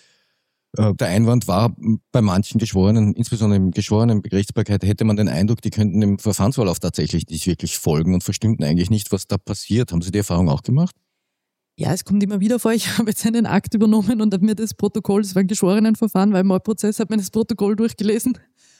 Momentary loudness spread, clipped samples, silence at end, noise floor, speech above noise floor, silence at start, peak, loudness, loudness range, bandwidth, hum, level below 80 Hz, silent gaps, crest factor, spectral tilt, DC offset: 6 LU; under 0.1%; 0.45 s; -79 dBFS; 61 dB; 0.75 s; -4 dBFS; -19 LUFS; 3 LU; 16.5 kHz; none; -44 dBFS; none; 14 dB; -6.5 dB/octave; under 0.1%